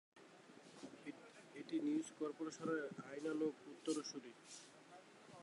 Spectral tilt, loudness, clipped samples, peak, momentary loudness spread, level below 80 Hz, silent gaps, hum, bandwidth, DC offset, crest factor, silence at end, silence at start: -4.5 dB/octave; -46 LUFS; under 0.1%; -30 dBFS; 19 LU; under -90 dBFS; none; none; 11.5 kHz; under 0.1%; 18 dB; 0 s; 0.15 s